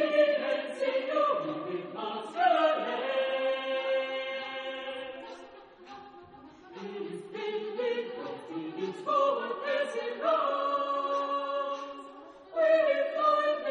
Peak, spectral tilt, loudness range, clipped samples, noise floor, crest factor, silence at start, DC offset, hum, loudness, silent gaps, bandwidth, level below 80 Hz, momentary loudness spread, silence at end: -14 dBFS; -4.5 dB/octave; 9 LU; under 0.1%; -52 dBFS; 18 dB; 0 s; under 0.1%; none; -30 LUFS; none; 10 kHz; -80 dBFS; 18 LU; 0 s